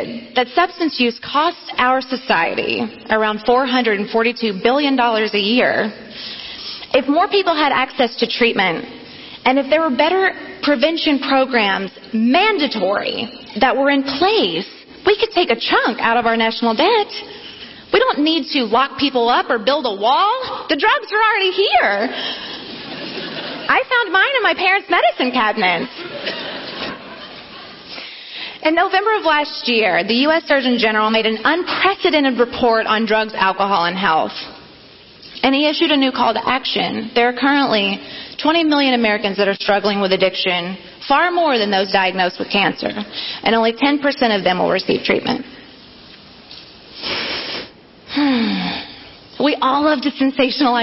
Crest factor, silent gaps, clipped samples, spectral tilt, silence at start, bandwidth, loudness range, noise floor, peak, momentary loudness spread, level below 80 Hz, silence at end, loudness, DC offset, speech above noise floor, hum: 14 dB; none; under 0.1%; -6.5 dB/octave; 0 s; 6 kHz; 4 LU; -43 dBFS; -2 dBFS; 13 LU; -54 dBFS; 0 s; -16 LUFS; under 0.1%; 26 dB; none